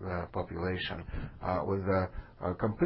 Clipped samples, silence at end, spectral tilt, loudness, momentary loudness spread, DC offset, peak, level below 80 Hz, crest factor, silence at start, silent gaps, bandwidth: under 0.1%; 0 s; -5.5 dB/octave; -35 LUFS; 8 LU; under 0.1%; -16 dBFS; -46 dBFS; 16 dB; 0 s; none; 5.6 kHz